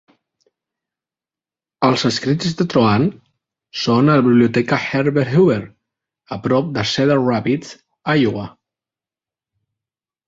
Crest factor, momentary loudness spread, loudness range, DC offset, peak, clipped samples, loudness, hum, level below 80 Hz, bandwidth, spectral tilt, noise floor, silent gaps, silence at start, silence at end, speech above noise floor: 16 dB; 12 LU; 4 LU; under 0.1%; -2 dBFS; under 0.1%; -17 LUFS; none; -54 dBFS; 7.8 kHz; -6.5 dB/octave; under -90 dBFS; none; 1.8 s; 1.75 s; over 74 dB